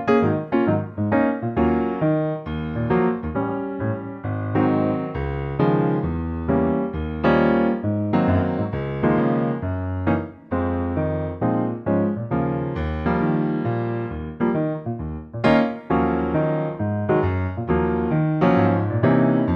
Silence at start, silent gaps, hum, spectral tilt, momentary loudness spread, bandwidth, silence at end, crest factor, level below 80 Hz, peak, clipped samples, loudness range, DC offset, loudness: 0 s; none; none; -10 dB/octave; 8 LU; 5.6 kHz; 0 s; 16 dB; -38 dBFS; -6 dBFS; under 0.1%; 3 LU; under 0.1%; -22 LUFS